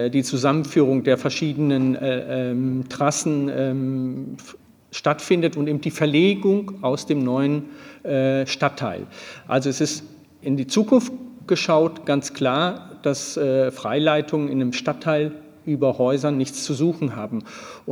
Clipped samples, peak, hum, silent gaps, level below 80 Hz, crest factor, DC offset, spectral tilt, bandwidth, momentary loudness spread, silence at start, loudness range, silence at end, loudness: under 0.1%; -4 dBFS; none; none; -68 dBFS; 18 dB; under 0.1%; -5.5 dB/octave; 19 kHz; 11 LU; 0 s; 2 LU; 0 s; -22 LUFS